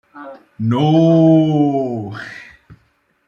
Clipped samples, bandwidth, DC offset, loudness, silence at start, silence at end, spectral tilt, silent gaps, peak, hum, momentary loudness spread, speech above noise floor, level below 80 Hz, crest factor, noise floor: under 0.1%; 6.8 kHz; under 0.1%; -14 LUFS; 0.15 s; 0.55 s; -9 dB/octave; none; -2 dBFS; none; 25 LU; 47 dB; -58 dBFS; 14 dB; -60 dBFS